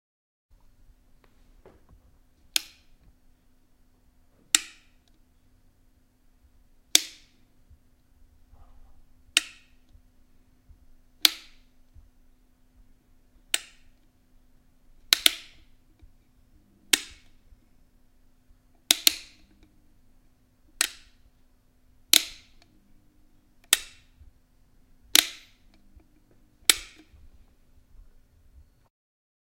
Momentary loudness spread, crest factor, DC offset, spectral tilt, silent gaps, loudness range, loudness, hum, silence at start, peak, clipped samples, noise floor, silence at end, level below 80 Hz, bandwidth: 22 LU; 34 dB; under 0.1%; 1.5 dB/octave; none; 8 LU; -24 LUFS; none; 2.55 s; 0 dBFS; under 0.1%; -62 dBFS; 2.65 s; -58 dBFS; 16.5 kHz